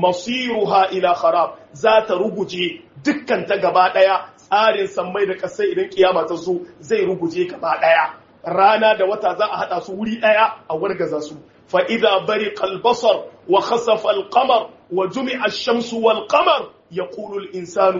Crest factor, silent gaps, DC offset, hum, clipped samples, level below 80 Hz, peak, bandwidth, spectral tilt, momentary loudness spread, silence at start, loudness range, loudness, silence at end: 18 dB; none; under 0.1%; none; under 0.1%; -64 dBFS; 0 dBFS; 7.4 kHz; -2 dB/octave; 9 LU; 0 s; 2 LU; -18 LUFS; 0 s